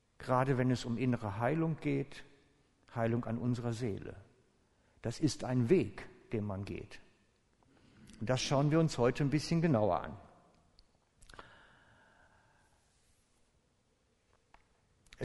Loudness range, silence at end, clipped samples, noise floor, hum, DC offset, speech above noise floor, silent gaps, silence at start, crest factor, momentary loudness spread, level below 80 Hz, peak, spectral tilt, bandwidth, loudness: 6 LU; 0 s; under 0.1%; -74 dBFS; none; under 0.1%; 41 dB; none; 0.2 s; 20 dB; 17 LU; -60 dBFS; -16 dBFS; -6.5 dB/octave; 11.5 kHz; -34 LUFS